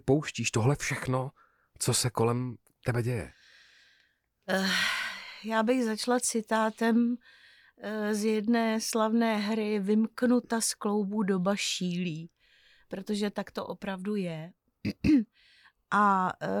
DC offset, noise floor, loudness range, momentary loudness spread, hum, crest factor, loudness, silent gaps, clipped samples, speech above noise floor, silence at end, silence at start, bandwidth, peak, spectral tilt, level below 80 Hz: under 0.1%; -71 dBFS; 5 LU; 12 LU; none; 16 dB; -29 LUFS; none; under 0.1%; 42 dB; 0 s; 0.05 s; 18.5 kHz; -14 dBFS; -4.5 dB/octave; -58 dBFS